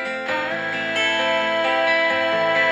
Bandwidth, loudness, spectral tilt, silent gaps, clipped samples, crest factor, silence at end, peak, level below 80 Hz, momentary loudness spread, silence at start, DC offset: 11.5 kHz; -20 LUFS; -3 dB/octave; none; under 0.1%; 14 dB; 0 s; -8 dBFS; -66 dBFS; 6 LU; 0 s; under 0.1%